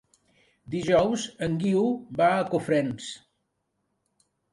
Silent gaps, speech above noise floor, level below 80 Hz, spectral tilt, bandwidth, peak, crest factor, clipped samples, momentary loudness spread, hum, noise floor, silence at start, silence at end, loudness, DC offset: none; 52 dB; -58 dBFS; -6 dB/octave; 11.5 kHz; -8 dBFS; 18 dB; under 0.1%; 13 LU; none; -77 dBFS; 0.7 s; 1.35 s; -25 LUFS; under 0.1%